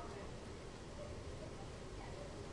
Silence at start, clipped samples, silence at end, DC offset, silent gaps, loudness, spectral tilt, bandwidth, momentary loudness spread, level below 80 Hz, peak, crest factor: 0 s; under 0.1%; 0 s; under 0.1%; none; -51 LUFS; -5.5 dB/octave; 11.5 kHz; 2 LU; -56 dBFS; -36 dBFS; 14 dB